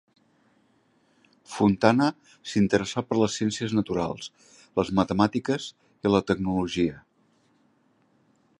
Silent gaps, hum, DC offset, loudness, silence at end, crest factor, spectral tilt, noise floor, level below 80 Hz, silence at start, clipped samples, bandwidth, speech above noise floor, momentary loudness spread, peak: none; none; under 0.1%; -25 LUFS; 1.6 s; 24 dB; -6 dB/octave; -66 dBFS; -54 dBFS; 1.5 s; under 0.1%; 11 kHz; 41 dB; 10 LU; -2 dBFS